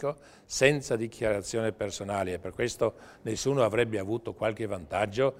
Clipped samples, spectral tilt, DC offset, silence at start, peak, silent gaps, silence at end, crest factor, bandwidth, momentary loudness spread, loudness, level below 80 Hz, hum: under 0.1%; -4.5 dB/octave; under 0.1%; 0 s; -6 dBFS; none; 0 s; 24 dB; 16 kHz; 11 LU; -30 LUFS; -56 dBFS; none